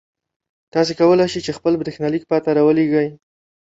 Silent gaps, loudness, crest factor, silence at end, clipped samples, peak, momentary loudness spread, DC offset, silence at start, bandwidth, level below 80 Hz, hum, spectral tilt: none; -18 LUFS; 14 dB; 0.55 s; under 0.1%; -4 dBFS; 8 LU; under 0.1%; 0.75 s; 8 kHz; -56 dBFS; none; -6.5 dB/octave